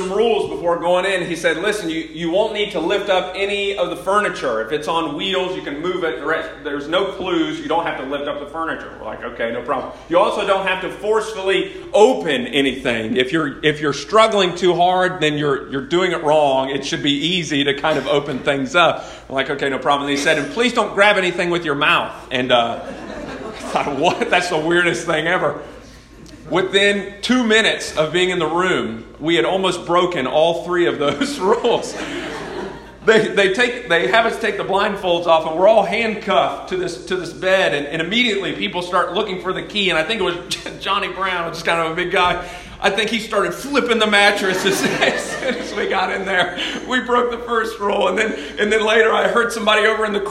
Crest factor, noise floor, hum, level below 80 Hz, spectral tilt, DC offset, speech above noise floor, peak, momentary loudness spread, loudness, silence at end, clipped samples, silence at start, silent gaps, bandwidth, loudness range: 18 dB; -40 dBFS; none; -48 dBFS; -4 dB/octave; under 0.1%; 22 dB; 0 dBFS; 10 LU; -18 LUFS; 0 s; under 0.1%; 0 s; none; 14 kHz; 4 LU